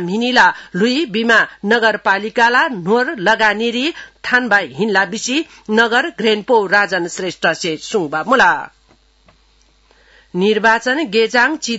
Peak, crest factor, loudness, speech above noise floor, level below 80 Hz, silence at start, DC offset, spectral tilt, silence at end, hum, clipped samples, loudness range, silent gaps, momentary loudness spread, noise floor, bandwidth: 0 dBFS; 16 dB; -15 LUFS; 38 dB; -56 dBFS; 0 s; under 0.1%; -3.5 dB/octave; 0 s; none; under 0.1%; 4 LU; none; 7 LU; -53 dBFS; 8 kHz